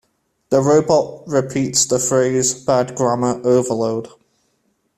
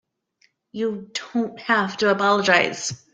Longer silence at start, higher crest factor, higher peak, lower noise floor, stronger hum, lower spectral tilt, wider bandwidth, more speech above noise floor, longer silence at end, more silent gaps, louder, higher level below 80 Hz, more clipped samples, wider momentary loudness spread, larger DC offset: second, 0.5 s vs 0.75 s; second, 16 dB vs 22 dB; about the same, -2 dBFS vs -2 dBFS; about the same, -66 dBFS vs -65 dBFS; neither; about the same, -4.5 dB/octave vs -3.5 dB/octave; first, 15 kHz vs 9.4 kHz; first, 49 dB vs 43 dB; first, 0.9 s vs 0.2 s; neither; first, -17 LUFS vs -21 LUFS; first, -54 dBFS vs -66 dBFS; neither; second, 6 LU vs 12 LU; neither